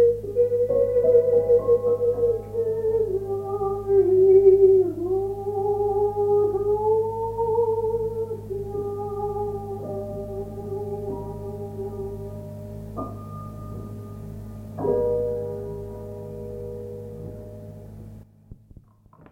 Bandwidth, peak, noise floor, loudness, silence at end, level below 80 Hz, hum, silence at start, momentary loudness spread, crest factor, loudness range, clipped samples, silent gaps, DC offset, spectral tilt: 2.6 kHz; -6 dBFS; -52 dBFS; -23 LUFS; 0.8 s; -46 dBFS; none; 0 s; 19 LU; 18 dB; 15 LU; under 0.1%; none; under 0.1%; -10 dB/octave